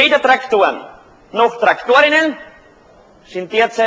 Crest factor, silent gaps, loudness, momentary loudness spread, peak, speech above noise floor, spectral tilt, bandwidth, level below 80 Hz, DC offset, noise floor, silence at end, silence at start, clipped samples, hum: 16 dB; none; -14 LUFS; 18 LU; 0 dBFS; 32 dB; -3 dB/octave; 8 kHz; -56 dBFS; under 0.1%; -46 dBFS; 0 s; 0 s; under 0.1%; none